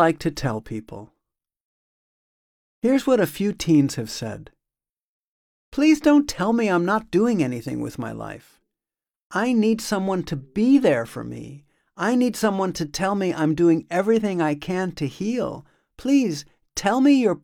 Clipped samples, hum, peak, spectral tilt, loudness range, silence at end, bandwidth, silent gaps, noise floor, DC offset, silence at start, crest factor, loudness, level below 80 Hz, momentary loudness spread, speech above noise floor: under 0.1%; none; -4 dBFS; -6 dB/octave; 3 LU; 0.05 s; 17 kHz; 1.61-2.82 s, 4.90-5.72 s, 9.22-9.30 s; under -90 dBFS; under 0.1%; 0 s; 18 dB; -22 LUFS; -54 dBFS; 16 LU; over 69 dB